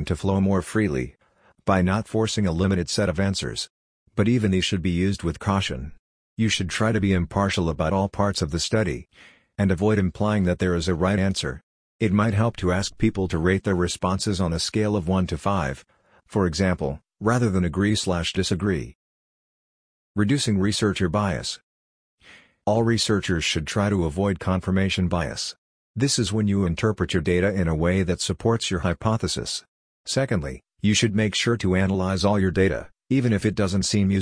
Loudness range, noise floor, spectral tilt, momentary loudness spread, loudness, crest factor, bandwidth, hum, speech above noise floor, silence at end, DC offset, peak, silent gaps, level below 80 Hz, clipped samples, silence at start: 2 LU; under -90 dBFS; -5.5 dB/octave; 8 LU; -23 LUFS; 18 dB; 10.5 kHz; none; over 68 dB; 0 s; under 0.1%; -6 dBFS; 3.70-4.06 s, 5.99-6.36 s, 11.63-11.99 s, 18.95-20.15 s, 21.63-22.18 s, 25.58-25.94 s, 29.68-30.04 s; -42 dBFS; under 0.1%; 0 s